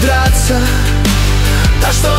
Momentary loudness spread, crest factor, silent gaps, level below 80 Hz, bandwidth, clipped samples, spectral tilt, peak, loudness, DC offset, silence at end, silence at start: 2 LU; 10 dB; none; -14 dBFS; 16.5 kHz; under 0.1%; -4.5 dB/octave; 0 dBFS; -12 LUFS; under 0.1%; 0 s; 0 s